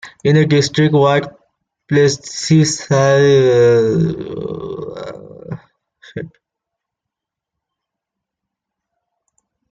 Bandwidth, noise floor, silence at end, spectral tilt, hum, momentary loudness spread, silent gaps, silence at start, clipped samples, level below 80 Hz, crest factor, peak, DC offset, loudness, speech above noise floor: 9.4 kHz; -83 dBFS; 3.45 s; -5.5 dB/octave; none; 21 LU; none; 0.05 s; under 0.1%; -52 dBFS; 14 dB; -2 dBFS; under 0.1%; -14 LUFS; 69 dB